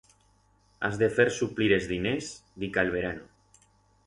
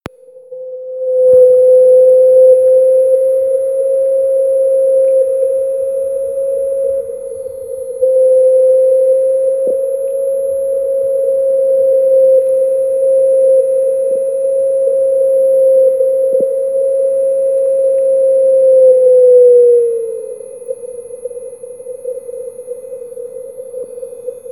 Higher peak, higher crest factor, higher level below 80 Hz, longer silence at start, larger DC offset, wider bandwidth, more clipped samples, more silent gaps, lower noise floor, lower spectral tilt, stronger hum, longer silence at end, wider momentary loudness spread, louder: second, -8 dBFS vs 0 dBFS; first, 20 dB vs 12 dB; about the same, -54 dBFS vs -58 dBFS; first, 0.8 s vs 0.35 s; second, under 0.1% vs 0.1%; about the same, 11.5 kHz vs 12 kHz; neither; neither; first, -65 dBFS vs -34 dBFS; about the same, -5 dB/octave vs -5.5 dB/octave; first, 50 Hz at -50 dBFS vs none; first, 0.8 s vs 0 s; second, 12 LU vs 20 LU; second, -28 LUFS vs -11 LUFS